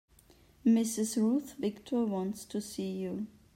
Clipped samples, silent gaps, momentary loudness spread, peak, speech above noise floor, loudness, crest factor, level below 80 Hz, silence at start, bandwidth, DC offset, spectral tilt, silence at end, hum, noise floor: under 0.1%; none; 10 LU; -16 dBFS; 30 dB; -33 LUFS; 16 dB; -68 dBFS; 0.65 s; 16 kHz; under 0.1%; -5.5 dB/octave; 0.25 s; none; -62 dBFS